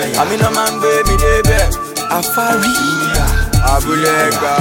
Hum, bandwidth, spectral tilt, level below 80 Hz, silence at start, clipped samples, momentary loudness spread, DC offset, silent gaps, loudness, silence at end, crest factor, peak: none; 17.5 kHz; -4 dB/octave; -18 dBFS; 0 s; under 0.1%; 3 LU; under 0.1%; none; -13 LUFS; 0 s; 12 dB; 0 dBFS